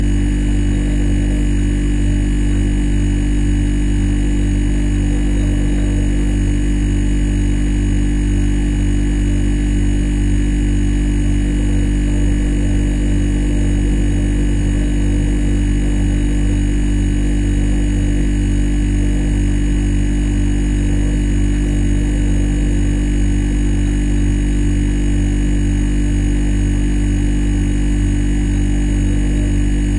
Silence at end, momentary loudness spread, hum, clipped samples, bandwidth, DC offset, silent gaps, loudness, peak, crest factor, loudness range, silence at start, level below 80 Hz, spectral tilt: 0 s; 0 LU; 50 Hz at -25 dBFS; under 0.1%; 11 kHz; under 0.1%; none; -17 LUFS; -4 dBFS; 10 dB; 0 LU; 0 s; -16 dBFS; -6.5 dB/octave